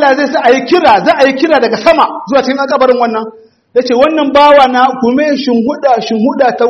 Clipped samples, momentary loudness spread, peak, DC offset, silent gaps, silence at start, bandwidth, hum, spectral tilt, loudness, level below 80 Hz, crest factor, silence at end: 0.8%; 6 LU; 0 dBFS; under 0.1%; none; 0 s; 9 kHz; none; -5 dB/octave; -9 LUFS; -50 dBFS; 8 dB; 0 s